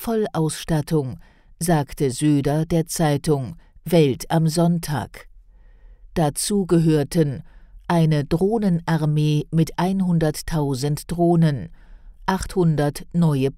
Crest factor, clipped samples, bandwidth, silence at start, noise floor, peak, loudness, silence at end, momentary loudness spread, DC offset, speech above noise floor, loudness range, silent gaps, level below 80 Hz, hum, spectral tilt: 16 dB; under 0.1%; 16 kHz; 0 s; -48 dBFS; -4 dBFS; -21 LUFS; 0 s; 9 LU; under 0.1%; 28 dB; 2 LU; none; -42 dBFS; none; -6.5 dB/octave